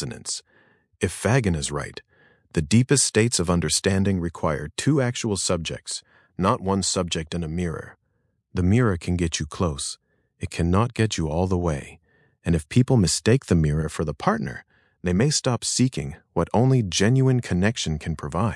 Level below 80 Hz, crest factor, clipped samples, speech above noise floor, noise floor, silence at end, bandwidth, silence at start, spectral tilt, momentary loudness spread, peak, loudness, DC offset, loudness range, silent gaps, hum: -46 dBFS; 20 dB; under 0.1%; 48 dB; -70 dBFS; 0 s; 12 kHz; 0 s; -5 dB/octave; 12 LU; -4 dBFS; -23 LUFS; under 0.1%; 4 LU; none; none